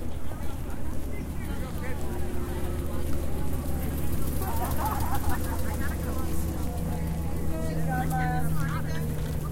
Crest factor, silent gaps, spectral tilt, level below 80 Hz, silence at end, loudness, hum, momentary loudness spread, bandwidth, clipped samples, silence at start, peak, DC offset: 12 dB; none; -6 dB/octave; -34 dBFS; 0 s; -32 LUFS; none; 7 LU; 17 kHz; under 0.1%; 0 s; -14 dBFS; under 0.1%